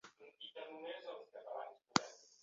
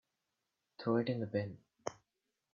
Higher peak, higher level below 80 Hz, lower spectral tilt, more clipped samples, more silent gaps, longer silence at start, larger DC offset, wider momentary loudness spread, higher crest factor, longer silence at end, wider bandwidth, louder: first, -10 dBFS vs -20 dBFS; second, -84 dBFS vs -78 dBFS; second, -2 dB/octave vs -7 dB/octave; neither; neither; second, 0.05 s vs 0.8 s; neither; first, 16 LU vs 12 LU; first, 36 dB vs 22 dB; second, 0.1 s vs 0.6 s; about the same, 7.4 kHz vs 7.4 kHz; second, -44 LUFS vs -39 LUFS